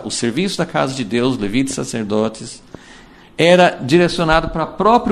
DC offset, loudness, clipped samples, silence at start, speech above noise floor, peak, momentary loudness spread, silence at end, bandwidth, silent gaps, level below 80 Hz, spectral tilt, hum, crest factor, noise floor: under 0.1%; -16 LUFS; under 0.1%; 0 s; 26 dB; 0 dBFS; 10 LU; 0 s; 14 kHz; none; -38 dBFS; -5 dB/octave; none; 16 dB; -42 dBFS